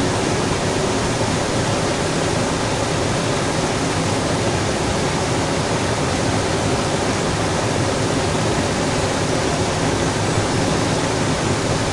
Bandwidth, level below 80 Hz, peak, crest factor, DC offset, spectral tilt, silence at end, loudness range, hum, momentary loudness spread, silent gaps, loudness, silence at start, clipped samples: 11.5 kHz; -36 dBFS; -6 dBFS; 14 dB; under 0.1%; -4.5 dB/octave; 0 s; 0 LU; none; 1 LU; none; -19 LUFS; 0 s; under 0.1%